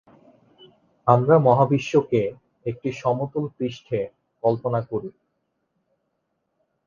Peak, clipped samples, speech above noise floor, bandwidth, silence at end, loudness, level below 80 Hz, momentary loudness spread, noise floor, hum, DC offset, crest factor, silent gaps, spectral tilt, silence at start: -2 dBFS; under 0.1%; 54 dB; 7.2 kHz; 1.75 s; -22 LUFS; -62 dBFS; 15 LU; -75 dBFS; none; under 0.1%; 22 dB; none; -8 dB/octave; 1.05 s